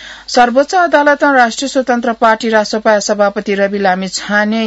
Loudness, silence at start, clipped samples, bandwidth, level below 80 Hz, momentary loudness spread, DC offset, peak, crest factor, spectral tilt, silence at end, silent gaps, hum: -12 LUFS; 0 s; 0.2%; 8 kHz; -50 dBFS; 5 LU; under 0.1%; 0 dBFS; 12 dB; -3.5 dB/octave; 0 s; none; none